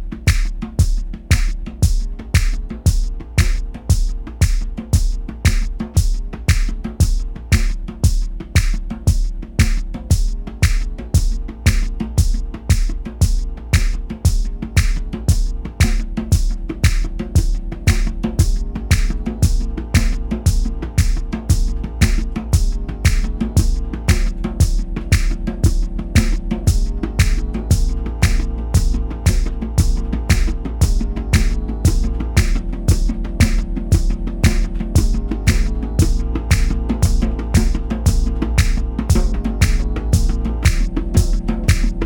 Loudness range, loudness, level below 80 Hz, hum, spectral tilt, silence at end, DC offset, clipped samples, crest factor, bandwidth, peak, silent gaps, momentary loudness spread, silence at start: 2 LU; -20 LUFS; -18 dBFS; none; -5.5 dB/octave; 0 s; under 0.1%; under 0.1%; 16 dB; 17.5 kHz; 0 dBFS; none; 6 LU; 0 s